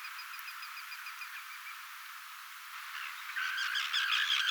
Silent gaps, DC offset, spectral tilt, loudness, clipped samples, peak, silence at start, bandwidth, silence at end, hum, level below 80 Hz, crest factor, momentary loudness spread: none; under 0.1%; 10.5 dB/octave; -36 LUFS; under 0.1%; -18 dBFS; 0 s; over 20 kHz; 0 s; none; under -90 dBFS; 20 dB; 16 LU